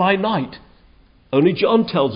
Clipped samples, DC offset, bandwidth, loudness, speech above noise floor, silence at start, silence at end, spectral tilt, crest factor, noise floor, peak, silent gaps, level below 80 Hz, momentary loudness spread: under 0.1%; under 0.1%; 5.4 kHz; -18 LUFS; 34 dB; 0 s; 0 s; -11.5 dB/octave; 16 dB; -51 dBFS; -4 dBFS; none; -54 dBFS; 8 LU